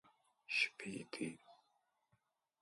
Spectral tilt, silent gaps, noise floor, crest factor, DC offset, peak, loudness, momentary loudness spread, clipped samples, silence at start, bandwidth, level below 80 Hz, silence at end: -3 dB/octave; none; -82 dBFS; 26 dB; under 0.1%; -22 dBFS; -41 LUFS; 11 LU; under 0.1%; 0.5 s; 11.5 kHz; -86 dBFS; 1.05 s